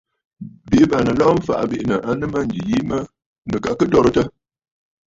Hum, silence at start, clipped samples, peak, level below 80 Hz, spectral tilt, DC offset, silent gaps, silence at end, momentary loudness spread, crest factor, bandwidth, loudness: none; 0.4 s; under 0.1%; -2 dBFS; -42 dBFS; -7 dB/octave; under 0.1%; 3.26-3.42 s; 0.8 s; 20 LU; 18 dB; 7.8 kHz; -18 LUFS